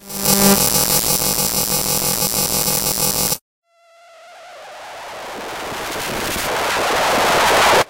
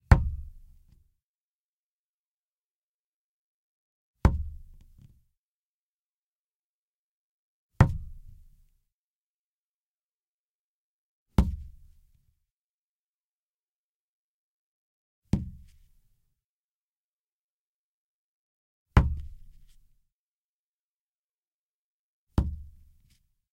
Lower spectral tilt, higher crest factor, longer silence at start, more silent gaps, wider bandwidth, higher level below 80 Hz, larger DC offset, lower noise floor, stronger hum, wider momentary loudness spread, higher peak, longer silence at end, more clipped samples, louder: second, -2 dB/octave vs -8 dB/octave; second, 16 dB vs 32 dB; about the same, 0 s vs 0.1 s; second, 3.41-3.62 s vs 1.23-4.14 s, 5.37-7.70 s, 8.92-11.26 s, 12.51-15.22 s, 16.44-18.86 s, 20.12-22.27 s; first, 18 kHz vs 12 kHz; about the same, -40 dBFS vs -38 dBFS; neither; second, -49 dBFS vs under -90 dBFS; neither; second, 17 LU vs 20 LU; about the same, -2 dBFS vs -4 dBFS; second, 0 s vs 0.9 s; neither; first, -16 LUFS vs -29 LUFS